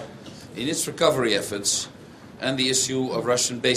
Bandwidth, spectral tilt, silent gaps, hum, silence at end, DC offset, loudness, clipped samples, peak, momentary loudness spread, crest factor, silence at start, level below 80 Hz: 14.5 kHz; -2.5 dB/octave; none; none; 0 s; under 0.1%; -23 LUFS; under 0.1%; -4 dBFS; 15 LU; 20 dB; 0 s; -60 dBFS